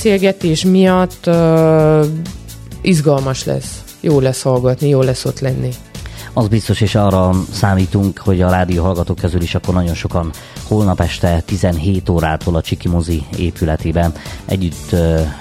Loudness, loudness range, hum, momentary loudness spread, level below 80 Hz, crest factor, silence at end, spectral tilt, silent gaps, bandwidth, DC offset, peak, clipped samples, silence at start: -15 LUFS; 3 LU; none; 10 LU; -30 dBFS; 14 dB; 0 s; -6.5 dB/octave; none; 16 kHz; under 0.1%; 0 dBFS; under 0.1%; 0 s